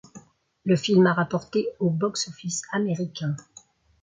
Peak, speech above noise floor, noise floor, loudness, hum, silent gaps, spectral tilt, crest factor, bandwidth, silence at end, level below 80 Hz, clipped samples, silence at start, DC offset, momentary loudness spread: -6 dBFS; 30 dB; -54 dBFS; -25 LUFS; none; none; -5.5 dB/octave; 18 dB; 9.4 kHz; 0.6 s; -66 dBFS; under 0.1%; 0.15 s; under 0.1%; 12 LU